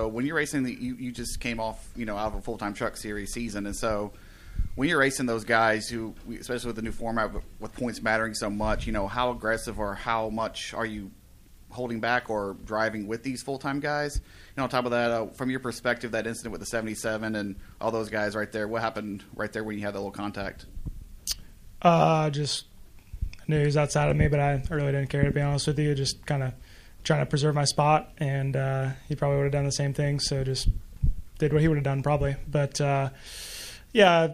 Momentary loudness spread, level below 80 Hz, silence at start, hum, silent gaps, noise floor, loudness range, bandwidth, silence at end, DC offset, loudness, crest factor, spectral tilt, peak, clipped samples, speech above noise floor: 13 LU; -40 dBFS; 0 s; none; none; -52 dBFS; 6 LU; 15.5 kHz; 0 s; under 0.1%; -28 LUFS; 22 dB; -5.5 dB/octave; -4 dBFS; under 0.1%; 25 dB